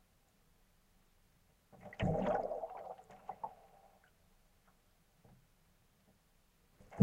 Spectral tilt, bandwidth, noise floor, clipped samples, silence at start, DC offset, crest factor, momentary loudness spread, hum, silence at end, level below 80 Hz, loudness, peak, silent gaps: -8 dB/octave; 16 kHz; -72 dBFS; under 0.1%; 1.75 s; under 0.1%; 28 dB; 20 LU; none; 0 s; -62 dBFS; -41 LUFS; -14 dBFS; none